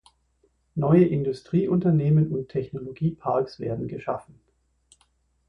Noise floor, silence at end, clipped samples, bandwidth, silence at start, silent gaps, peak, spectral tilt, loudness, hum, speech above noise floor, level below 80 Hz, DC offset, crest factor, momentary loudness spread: -67 dBFS; 1.25 s; under 0.1%; 8.4 kHz; 0.75 s; none; -6 dBFS; -10 dB/octave; -24 LUFS; none; 44 dB; -56 dBFS; under 0.1%; 18 dB; 13 LU